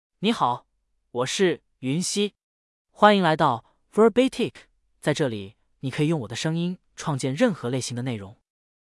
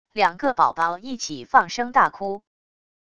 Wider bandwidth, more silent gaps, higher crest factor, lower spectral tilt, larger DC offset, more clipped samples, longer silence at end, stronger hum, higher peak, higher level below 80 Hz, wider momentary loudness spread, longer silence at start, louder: first, 12 kHz vs 10 kHz; first, 2.43-2.85 s vs none; about the same, 22 dB vs 22 dB; first, -5 dB/octave vs -3 dB/octave; second, under 0.1% vs 0.3%; neither; second, 0.6 s vs 0.75 s; neither; about the same, -2 dBFS vs -2 dBFS; about the same, -64 dBFS vs -60 dBFS; about the same, 13 LU vs 11 LU; about the same, 0.2 s vs 0.15 s; about the same, -24 LUFS vs -22 LUFS